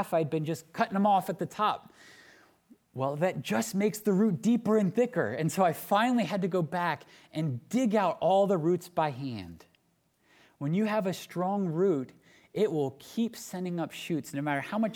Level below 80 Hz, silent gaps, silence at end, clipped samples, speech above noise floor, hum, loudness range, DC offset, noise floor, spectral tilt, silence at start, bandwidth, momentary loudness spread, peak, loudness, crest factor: -74 dBFS; none; 0 s; under 0.1%; 43 dB; none; 4 LU; under 0.1%; -71 dBFS; -6 dB/octave; 0 s; 19.5 kHz; 10 LU; -12 dBFS; -29 LUFS; 18 dB